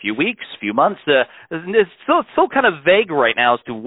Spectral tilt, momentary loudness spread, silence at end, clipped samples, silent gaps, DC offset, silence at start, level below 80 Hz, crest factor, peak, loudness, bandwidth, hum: -9.5 dB/octave; 7 LU; 0 s; under 0.1%; none; under 0.1%; 0 s; -60 dBFS; 16 dB; -2 dBFS; -17 LUFS; 4.1 kHz; none